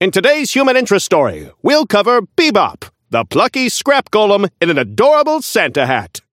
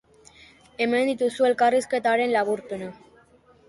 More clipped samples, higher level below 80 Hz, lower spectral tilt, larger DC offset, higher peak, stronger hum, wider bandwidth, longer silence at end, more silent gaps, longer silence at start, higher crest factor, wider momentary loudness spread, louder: neither; first, -54 dBFS vs -66 dBFS; about the same, -3.5 dB/octave vs -4 dB/octave; neither; first, 0 dBFS vs -10 dBFS; neither; first, 16.5 kHz vs 11.5 kHz; second, 0.15 s vs 0.75 s; neither; second, 0 s vs 0.8 s; about the same, 14 dB vs 16 dB; second, 6 LU vs 14 LU; first, -13 LUFS vs -23 LUFS